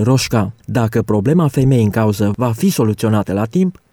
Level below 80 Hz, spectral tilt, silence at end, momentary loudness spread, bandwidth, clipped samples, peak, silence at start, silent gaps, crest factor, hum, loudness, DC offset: -42 dBFS; -7 dB/octave; 0.2 s; 5 LU; 18.5 kHz; under 0.1%; -4 dBFS; 0 s; none; 10 dB; none; -15 LUFS; under 0.1%